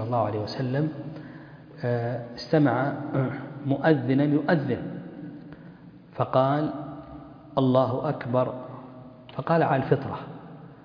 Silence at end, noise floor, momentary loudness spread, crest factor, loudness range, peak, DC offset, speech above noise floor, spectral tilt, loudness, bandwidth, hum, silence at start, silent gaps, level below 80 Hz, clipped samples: 0.05 s; -47 dBFS; 21 LU; 20 dB; 3 LU; -6 dBFS; under 0.1%; 22 dB; -9 dB/octave; -26 LUFS; 5.2 kHz; none; 0 s; none; -60 dBFS; under 0.1%